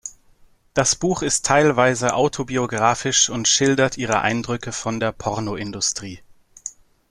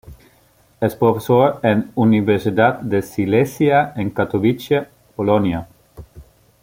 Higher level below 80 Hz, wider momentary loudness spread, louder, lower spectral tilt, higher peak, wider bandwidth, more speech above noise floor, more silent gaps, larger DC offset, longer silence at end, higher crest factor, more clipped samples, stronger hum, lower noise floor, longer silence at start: about the same, -50 dBFS vs -50 dBFS; first, 14 LU vs 7 LU; about the same, -19 LUFS vs -18 LUFS; second, -3 dB/octave vs -7.5 dB/octave; about the same, -2 dBFS vs 0 dBFS; second, 13.5 kHz vs 16.5 kHz; second, 33 dB vs 38 dB; neither; neither; about the same, 0.4 s vs 0.4 s; about the same, 20 dB vs 18 dB; neither; neither; about the same, -53 dBFS vs -55 dBFS; about the same, 0.05 s vs 0.1 s